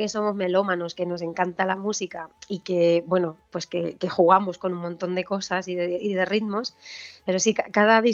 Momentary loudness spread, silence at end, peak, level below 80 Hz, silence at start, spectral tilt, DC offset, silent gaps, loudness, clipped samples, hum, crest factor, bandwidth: 15 LU; 0 s; -2 dBFS; -70 dBFS; 0 s; -4.5 dB/octave; under 0.1%; none; -24 LUFS; under 0.1%; none; 22 dB; 8 kHz